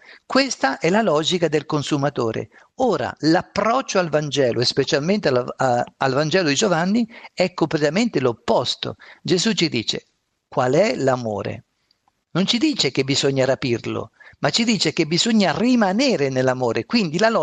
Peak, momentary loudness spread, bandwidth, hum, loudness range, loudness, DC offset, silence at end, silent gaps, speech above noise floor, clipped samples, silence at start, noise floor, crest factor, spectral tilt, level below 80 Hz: -4 dBFS; 8 LU; 9.4 kHz; none; 3 LU; -20 LUFS; under 0.1%; 0 s; none; 46 dB; under 0.1%; 0.1 s; -66 dBFS; 16 dB; -4.5 dB/octave; -58 dBFS